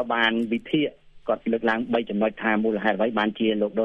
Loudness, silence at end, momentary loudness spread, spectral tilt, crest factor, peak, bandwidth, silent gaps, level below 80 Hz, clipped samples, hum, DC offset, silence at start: -24 LUFS; 0 s; 5 LU; -7 dB/octave; 18 dB; -6 dBFS; 5.8 kHz; none; -58 dBFS; under 0.1%; none; under 0.1%; 0 s